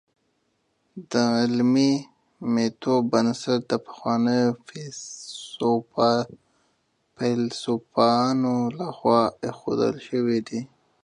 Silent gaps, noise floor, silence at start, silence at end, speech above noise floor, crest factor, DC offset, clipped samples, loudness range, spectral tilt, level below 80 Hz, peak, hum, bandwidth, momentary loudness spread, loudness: none; -71 dBFS; 0.95 s; 0.4 s; 48 dB; 20 dB; under 0.1%; under 0.1%; 3 LU; -5.5 dB/octave; -68 dBFS; -4 dBFS; none; 10.5 kHz; 15 LU; -24 LUFS